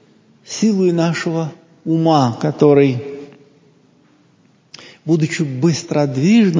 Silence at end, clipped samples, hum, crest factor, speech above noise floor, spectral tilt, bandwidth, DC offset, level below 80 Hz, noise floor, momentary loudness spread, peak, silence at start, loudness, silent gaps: 0 s; under 0.1%; none; 16 dB; 39 dB; -6.5 dB/octave; 7.6 kHz; under 0.1%; -62 dBFS; -54 dBFS; 16 LU; 0 dBFS; 0.5 s; -16 LUFS; none